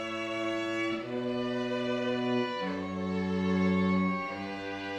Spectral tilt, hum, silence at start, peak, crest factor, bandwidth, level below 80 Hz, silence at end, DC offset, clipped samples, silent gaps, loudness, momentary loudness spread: -6.5 dB/octave; none; 0 s; -16 dBFS; 14 dB; 8.4 kHz; -66 dBFS; 0 s; under 0.1%; under 0.1%; none; -31 LUFS; 7 LU